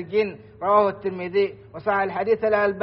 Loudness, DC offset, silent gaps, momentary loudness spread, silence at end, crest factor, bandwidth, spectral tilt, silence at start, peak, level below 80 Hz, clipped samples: -23 LUFS; under 0.1%; none; 10 LU; 0 s; 18 dB; 5.8 kHz; -4 dB/octave; 0 s; -4 dBFS; -58 dBFS; under 0.1%